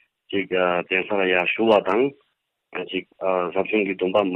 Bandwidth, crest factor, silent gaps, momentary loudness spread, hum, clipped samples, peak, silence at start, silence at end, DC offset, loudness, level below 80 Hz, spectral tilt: 6.2 kHz; 16 dB; none; 11 LU; none; under 0.1%; -6 dBFS; 0.3 s; 0 s; under 0.1%; -22 LUFS; -68 dBFS; -7 dB/octave